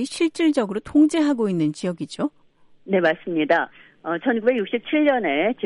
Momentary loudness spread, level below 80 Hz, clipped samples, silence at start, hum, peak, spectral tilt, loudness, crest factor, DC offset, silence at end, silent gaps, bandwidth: 10 LU; -60 dBFS; under 0.1%; 0 s; none; -6 dBFS; -5.5 dB/octave; -21 LUFS; 14 dB; under 0.1%; 0 s; none; 11.5 kHz